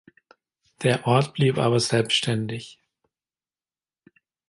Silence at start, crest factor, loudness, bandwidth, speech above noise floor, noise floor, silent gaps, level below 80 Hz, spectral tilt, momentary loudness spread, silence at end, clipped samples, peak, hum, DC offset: 0.8 s; 20 dB; -22 LUFS; 11.5 kHz; over 68 dB; under -90 dBFS; none; -62 dBFS; -5 dB/octave; 12 LU; 1.75 s; under 0.1%; -6 dBFS; none; under 0.1%